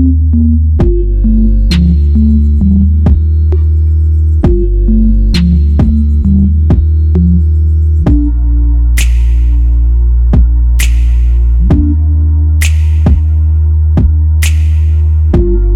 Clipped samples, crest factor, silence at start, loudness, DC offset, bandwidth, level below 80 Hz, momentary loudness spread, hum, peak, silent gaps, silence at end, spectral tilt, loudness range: under 0.1%; 6 dB; 0 s; -10 LUFS; under 0.1%; 12.5 kHz; -8 dBFS; 2 LU; none; 0 dBFS; none; 0 s; -7.5 dB/octave; 1 LU